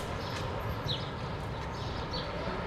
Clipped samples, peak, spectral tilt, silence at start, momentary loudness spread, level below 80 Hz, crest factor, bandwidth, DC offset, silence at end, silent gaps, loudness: under 0.1%; -20 dBFS; -5.5 dB/octave; 0 s; 3 LU; -46 dBFS; 16 dB; 14 kHz; under 0.1%; 0 s; none; -36 LUFS